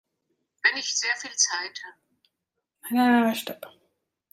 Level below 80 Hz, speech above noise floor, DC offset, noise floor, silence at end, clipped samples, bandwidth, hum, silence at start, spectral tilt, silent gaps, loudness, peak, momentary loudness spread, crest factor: -82 dBFS; 57 dB; under 0.1%; -83 dBFS; 0.65 s; under 0.1%; 16 kHz; none; 0.65 s; -1 dB/octave; none; -24 LUFS; -8 dBFS; 20 LU; 20 dB